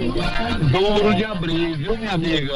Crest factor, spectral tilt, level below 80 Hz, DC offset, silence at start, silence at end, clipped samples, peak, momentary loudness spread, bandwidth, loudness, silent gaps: 12 dB; -6.5 dB/octave; -30 dBFS; under 0.1%; 0 s; 0 s; under 0.1%; -6 dBFS; 6 LU; 10.5 kHz; -20 LUFS; none